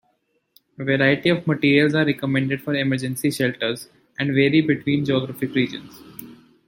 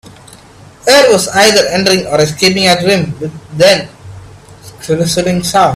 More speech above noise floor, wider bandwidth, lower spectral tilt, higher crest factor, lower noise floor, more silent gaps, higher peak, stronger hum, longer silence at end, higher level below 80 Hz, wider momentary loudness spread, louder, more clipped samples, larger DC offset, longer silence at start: first, 48 dB vs 27 dB; about the same, 17 kHz vs 16.5 kHz; first, -6 dB/octave vs -3.5 dB/octave; first, 18 dB vs 12 dB; first, -68 dBFS vs -37 dBFS; neither; second, -4 dBFS vs 0 dBFS; neither; first, 0.35 s vs 0 s; second, -60 dBFS vs -44 dBFS; first, 17 LU vs 12 LU; second, -21 LUFS vs -10 LUFS; second, under 0.1% vs 0.2%; neither; about the same, 0.8 s vs 0.85 s